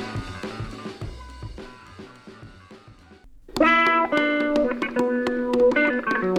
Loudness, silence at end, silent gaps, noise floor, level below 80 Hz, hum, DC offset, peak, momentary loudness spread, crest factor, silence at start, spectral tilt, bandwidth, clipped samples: -21 LUFS; 0 s; none; -49 dBFS; -46 dBFS; none; under 0.1%; -6 dBFS; 24 LU; 18 dB; 0 s; -5.5 dB/octave; 13 kHz; under 0.1%